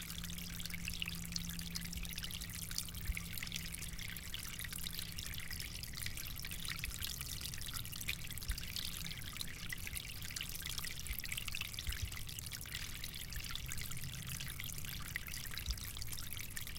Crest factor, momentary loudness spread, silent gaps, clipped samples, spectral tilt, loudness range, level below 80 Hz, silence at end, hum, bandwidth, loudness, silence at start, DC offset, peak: 26 dB; 3 LU; none; under 0.1%; -2 dB/octave; 1 LU; -50 dBFS; 0 s; none; 17 kHz; -43 LUFS; 0 s; under 0.1%; -18 dBFS